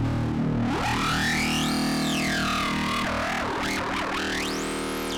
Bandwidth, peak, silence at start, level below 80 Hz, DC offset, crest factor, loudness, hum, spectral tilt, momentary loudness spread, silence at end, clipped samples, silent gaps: 19.5 kHz; -16 dBFS; 0 s; -42 dBFS; under 0.1%; 10 dB; -25 LUFS; none; -4 dB/octave; 4 LU; 0 s; under 0.1%; none